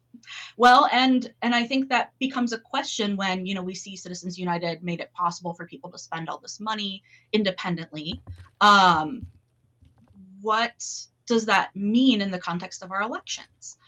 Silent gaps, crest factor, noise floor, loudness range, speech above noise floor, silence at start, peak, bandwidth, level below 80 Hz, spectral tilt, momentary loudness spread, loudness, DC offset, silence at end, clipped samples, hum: none; 18 dB; -61 dBFS; 9 LU; 37 dB; 0.25 s; -6 dBFS; 10.5 kHz; -64 dBFS; -4 dB/octave; 19 LU; -24 LUFS; under 0.1%; 0.15 s; under 0.1%; none